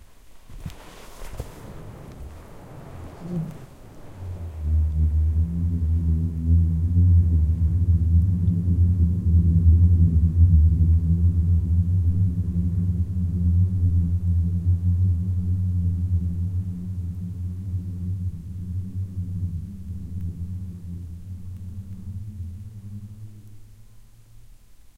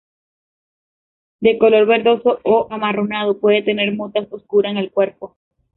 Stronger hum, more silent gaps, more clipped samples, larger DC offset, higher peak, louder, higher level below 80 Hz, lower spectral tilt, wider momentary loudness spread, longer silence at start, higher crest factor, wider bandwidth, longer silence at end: neither; neither; neither; neither; second, -6 dBFS vs -2 dBFS; second, -23 LUFS vs -17 LUFS; first, -28 dBFS vs -60 dBFS; about the same, -10 dB/octave vs -10 dB/octave; first, 22 LU vs 10 LU; second, 0.1 s vs 1.4 s; about the same, 16 dB vs 16 dB; second, 1.9 kHz vs 4.1 kHz; second, 0.05 s vs 0.5 s